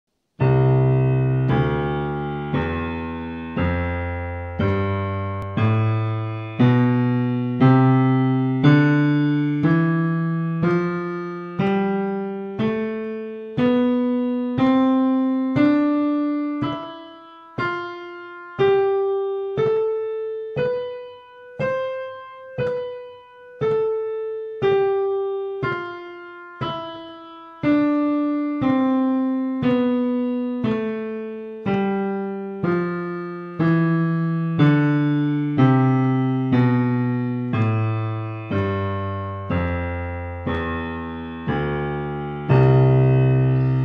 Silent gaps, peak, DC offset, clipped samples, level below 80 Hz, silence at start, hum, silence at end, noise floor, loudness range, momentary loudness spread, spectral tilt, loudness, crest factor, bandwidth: none; -2 dBFS; under 0.1%; under 0.1%; -46 dBFS; 0.4 s; none; 0 s; -43 dBFS; 7 LU; 12 LU; -10 dB/octave; -21 LUFS; 18 dB; 5.2 kHz